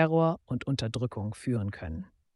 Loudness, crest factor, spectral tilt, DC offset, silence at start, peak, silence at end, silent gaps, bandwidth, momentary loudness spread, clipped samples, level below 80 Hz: -31 LUFS; 20 dB; -7 dB/octave; under 0.1%; 0 s; -10 dBFS; 0.3 s; none; 11.5 kHz; 13 LU; under 0.1%; -52 dBFS